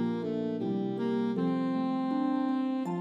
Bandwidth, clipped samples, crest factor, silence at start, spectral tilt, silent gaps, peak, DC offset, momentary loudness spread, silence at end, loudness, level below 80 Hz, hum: 7.6 kHz; under 0.1%; 10 dB; 0 s; -8.5 dB/octave; none; -20 dBFS; under 0.1%; 3 LU; 0 s; -31 LUFS; -82 dBFS; none